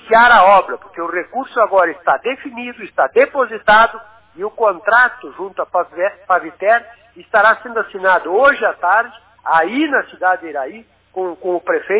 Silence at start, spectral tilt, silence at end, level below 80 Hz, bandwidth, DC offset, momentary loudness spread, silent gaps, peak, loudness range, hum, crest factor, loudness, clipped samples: 0.05 s; -7 dB/octave; 0 s; -54 dBFS; 4 kHz; under 0.1%; 15 LU; none; 0 dBFS; 2 LU; none; 16 dB; -15 LUFS; under 0.1%